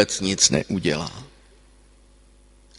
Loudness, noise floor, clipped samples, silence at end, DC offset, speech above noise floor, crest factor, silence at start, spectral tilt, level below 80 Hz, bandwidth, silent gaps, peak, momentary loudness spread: -20 LUFS; -53 dBFS; under 0.1%; 1.55 s; under 0.1%; 31 dB; 24 dB; 0 s; -3 dB/octave; -48 dBFS; 11.5 kHz; none; 0 dBFS; 16 LU